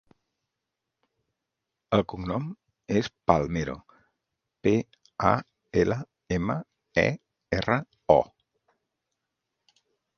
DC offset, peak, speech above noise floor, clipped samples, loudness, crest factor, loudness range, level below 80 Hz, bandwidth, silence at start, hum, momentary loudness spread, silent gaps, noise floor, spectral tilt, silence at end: under 0.1%; -2 dBFS; 60 dB; under 0.1%; -27 LUFS; 28 dB; 3 LU; -50 dBFS; 7 kHz; 1.9 s; none; 13 LU; none; -85 dBFS; -6.5 dB/octave; 1.95 s